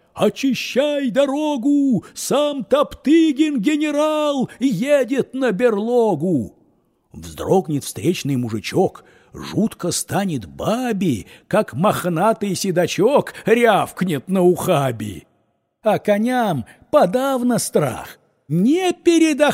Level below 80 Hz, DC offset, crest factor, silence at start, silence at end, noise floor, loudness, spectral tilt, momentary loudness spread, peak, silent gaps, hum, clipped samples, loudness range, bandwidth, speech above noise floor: -54 dBFS; under 0.1%; 16 dB; 0.15 s; 0 s; -66 dBFS; -19 LUFS; -5.5 dB/octave; 8 LU; -2 dBFS; none; none; under 0.1%; 4 LU; 16 kHz; 48 dB